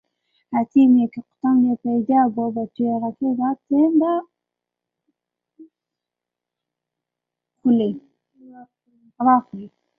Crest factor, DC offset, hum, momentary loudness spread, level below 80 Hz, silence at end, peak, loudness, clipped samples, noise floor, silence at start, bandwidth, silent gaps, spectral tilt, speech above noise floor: 18 dB; under 0.1%; 60 Hz at -50 dBFS; 10 LU; -68 dBFS; 0.3 s; -4 dBFS; -20 LUFS; under 0.1%; -86 dBFS; 0.5 s; 3.4 kHz; none; -10 dB/octave; 67 dB